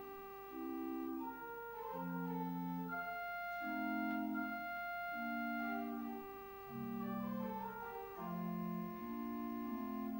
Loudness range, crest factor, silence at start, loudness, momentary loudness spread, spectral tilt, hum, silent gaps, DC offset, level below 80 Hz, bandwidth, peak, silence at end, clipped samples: 3 LU; 14 dB; 0 s; -44 LUFS; 7 LU; -8 dB/octave; 50 Hz at -75 dBFS; none; under 0.1%; -72 dBFS; 16 kHz; -30 dBFS; 0 s; under 0.1%